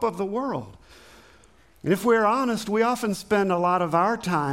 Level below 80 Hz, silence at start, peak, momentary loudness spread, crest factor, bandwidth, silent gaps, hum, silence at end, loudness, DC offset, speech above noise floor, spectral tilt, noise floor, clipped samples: -58 dBFS; 0 s; -8 dBFS; 10 LU; 16 dB; 16.5 kHz; none; none; 0 s; -24 LUFS; under 0.1%; 33 dB; -5.5 dB/octave; -56 dBFS; under 0.1%